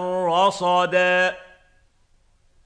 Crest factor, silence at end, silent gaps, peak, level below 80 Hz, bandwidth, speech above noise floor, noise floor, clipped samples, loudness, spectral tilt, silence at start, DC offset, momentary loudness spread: 16 dB; 1.25 s; none; -6 dBFS; -60 dBFS; 10 kHz; 40 dB; -59 dBFS; under 0.1%; -19 LUFS; -4 dB/octave; 0 s; under 0.1%; 5 LU